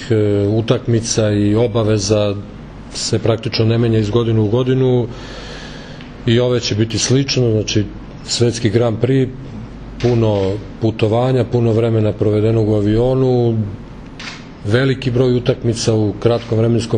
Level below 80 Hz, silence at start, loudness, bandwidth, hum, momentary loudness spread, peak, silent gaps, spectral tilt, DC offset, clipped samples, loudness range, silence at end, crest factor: -36 dBFS; 0 s; -16 LUFS; 10 kHz; none; 15 LU; 0 dBFS; none; -6 dB/octave; under 0.1%; under 0.1%; 2 LU; 0 s; 16 dB